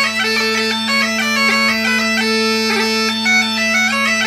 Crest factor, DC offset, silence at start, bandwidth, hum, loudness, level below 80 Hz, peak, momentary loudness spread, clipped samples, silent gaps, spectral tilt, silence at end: 12 dB; under 0.1%; 0 s; 16 kHz; none; -14 LUFS; -62 dBFS; -4 dBFS; 2 LU; under 0.1%; none; -2 dB/octave; 0 s